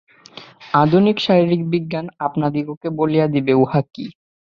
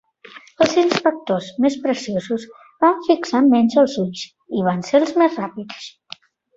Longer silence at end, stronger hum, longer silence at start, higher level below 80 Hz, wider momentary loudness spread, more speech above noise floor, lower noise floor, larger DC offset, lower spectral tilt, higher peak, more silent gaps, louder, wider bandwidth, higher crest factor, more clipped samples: second, 0.4 s vs 0.7 s; neither; about the same, 0.35 s vs 0.35 s; first, -56 dBFS vs -62 dBFS; second, 13 LU vs 17 LU; about the same, 25 dB vs 26 dB; about the same, -42 dBFS vs -44 dBFS; neither; first, -8.5 dB/octave vs -5.5 dB/octave; about the same, -2 dBFS vs 0 dBFS; first, 2.77-2.81 s vs none; about the same, -18 LUFS vs -18 LUFS; second, 7 kHz vs 8 kHz; about the same, 16 dB vs 18 dB; neither